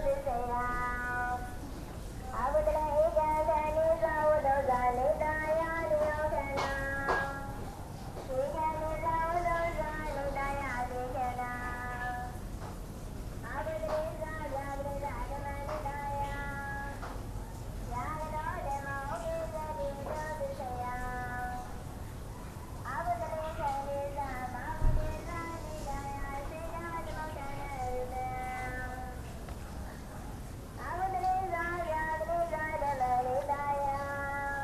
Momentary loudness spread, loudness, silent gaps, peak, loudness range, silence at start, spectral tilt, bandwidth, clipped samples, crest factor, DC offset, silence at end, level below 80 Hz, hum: 14 LU; -35 LUFS; none; -16 dBFS; 9 LU; 0 s; -6 dB/octave; 14 kHz; under 0.1%; 18 dB; under 0.1%; 0 s; -42 dBFS; none